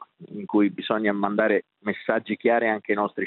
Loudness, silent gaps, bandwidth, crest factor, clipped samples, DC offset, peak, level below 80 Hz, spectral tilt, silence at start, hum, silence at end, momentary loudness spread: -24 LUFS; none; 4.3 kHz; 18 dB; under 0.1%; under 0.1%; -6 dBFS; -74 dBFS; -9.5 dB/octave; 0 s; none; 0 s; 8 LU